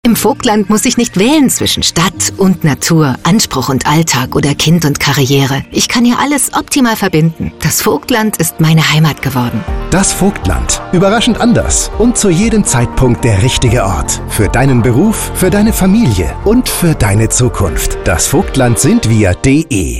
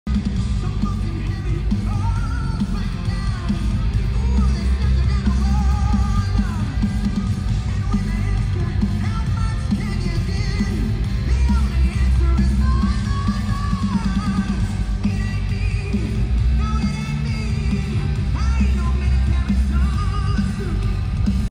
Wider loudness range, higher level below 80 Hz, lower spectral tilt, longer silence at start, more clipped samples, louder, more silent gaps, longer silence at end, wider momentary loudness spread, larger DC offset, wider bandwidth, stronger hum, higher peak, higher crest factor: about the same, 1 LU vs 2 LU; about the same, -24 dBFS vs -22 dBFS; second, -4.5 dB/octave vs -7 dB/octave; about the same, 0.05 s vs 0.05 s; neither; first, -10 LUFS vs -21 LUFS; neither; about the same, 0 s vs 0 s; about the same, 4 LU vs 4 LU; first, 0.8% vs under 0.1%; first, 16.5 kHz vs 10.5 kHz; neither; first, 0 dBFS vs -6 dBFS; about the same, 10 dB vs 12 dB